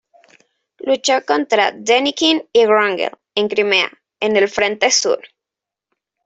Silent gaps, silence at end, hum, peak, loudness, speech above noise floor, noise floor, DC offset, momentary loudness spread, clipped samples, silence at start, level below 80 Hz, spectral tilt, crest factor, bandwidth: none; 1 s; none; -2 dBFS; -16 LUFS; 70 dB; -86 dBFS; under 0.1%; 8 LU; under 0.1%; 0.85 s; -64 dBFS; -1.5 dB/octave; 16 dB; 8.4 kHz